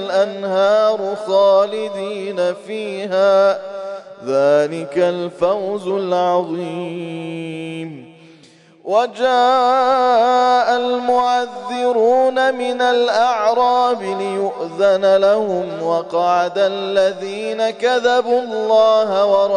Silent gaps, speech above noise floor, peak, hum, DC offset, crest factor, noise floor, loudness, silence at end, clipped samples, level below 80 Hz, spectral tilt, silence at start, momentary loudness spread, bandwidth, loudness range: none; 31 dB; -4 dBFS; none; under 0.1%; 12 dB; -47 dBFS; -16 LUFS; 0 s; under 0.1%; -64 dBFS; -4.5 dB/octave; 0 s; 12 LU; 10.5 kHz; 5 LU